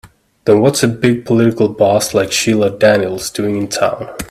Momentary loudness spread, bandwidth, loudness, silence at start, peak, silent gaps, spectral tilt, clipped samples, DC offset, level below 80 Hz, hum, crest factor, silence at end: 7 LU; 16 kHz; -13 LUFS; 0.05 s; 0 dBFS; none; -5 dB/octave; under 0.1%; under 0.1%; -46 dBFS; none; 14 dB; 0.05 s